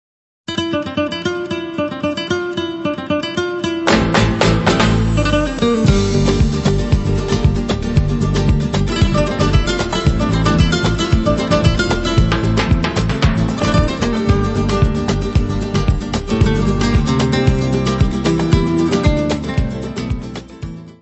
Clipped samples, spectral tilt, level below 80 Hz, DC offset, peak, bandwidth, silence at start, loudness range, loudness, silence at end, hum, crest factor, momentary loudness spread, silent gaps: under 0.1%; -6 dB/octave; -22 dBFS; under 0.1%; 0 dBFS; 8.4 kHz; 0.5 s; 3 LU; -16 LUFS; 0.1 s; none; 16 dB; 7 LU; none